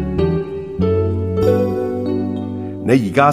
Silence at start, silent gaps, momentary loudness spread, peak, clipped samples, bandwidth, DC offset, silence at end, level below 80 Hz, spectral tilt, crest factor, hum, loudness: 0 s; none; 9 LU; 0 dBFS; under 0.1%; 14.5 kHz; 0.4%; 0 s; -36 dBFS; -8 dB/octave; 16 dB; none; -18 LUFS